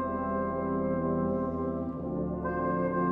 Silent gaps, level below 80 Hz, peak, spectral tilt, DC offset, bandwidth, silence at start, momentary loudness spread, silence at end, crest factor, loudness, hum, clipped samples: none; -48 dBFS; -18 dBFS; -12 dB/octave; under 0.1%; 3.2 kHz; 0 s; 4 LU; 0 s; 12 dB; -31 LUFS; none; under 0.1%